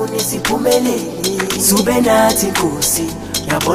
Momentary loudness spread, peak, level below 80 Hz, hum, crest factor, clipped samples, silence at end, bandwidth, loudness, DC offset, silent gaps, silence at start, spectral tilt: 7 LU; 0 dBFS; -40 dBFS; none; 14 dB; under 0.1%; 0 s; 15.5 kHz; -14 LUFS; under 0.1%; none; 0 s; -3 dB/octave